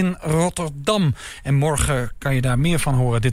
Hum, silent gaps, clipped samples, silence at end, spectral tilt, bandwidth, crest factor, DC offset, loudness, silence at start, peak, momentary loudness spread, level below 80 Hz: none; none; under 0.1%; 0 s; -5.5 dB/octave; 16 kHz; 14 dB; 0.3%; -20 LUFS; 0 s; -6 dBFS; 4 LU; -32 dBFS